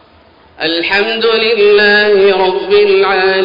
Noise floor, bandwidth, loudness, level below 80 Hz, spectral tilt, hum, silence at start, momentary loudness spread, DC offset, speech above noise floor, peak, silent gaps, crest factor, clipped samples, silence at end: -44 dBFS; 5.4 kHz; -9 LUFS; -48 dBFS; -5.5 dB/octave; none; 0.6 s; 6 LU; under 0.1%; 34 dB; -2 dBFS; none; 10 dB; under 0.1%; 0 s